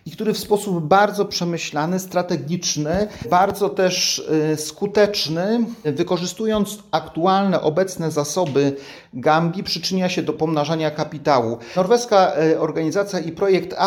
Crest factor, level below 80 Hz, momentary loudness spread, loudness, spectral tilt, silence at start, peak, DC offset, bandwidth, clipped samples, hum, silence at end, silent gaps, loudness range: 18 dB; -54 dBFS; 7 LU; -20 LUFS; -4.5 dB/octave; 0.05 s; -2 dBFS; under 0.1%; 17.5 kHz; under 0.1%; none; 0 s; none; 2 LU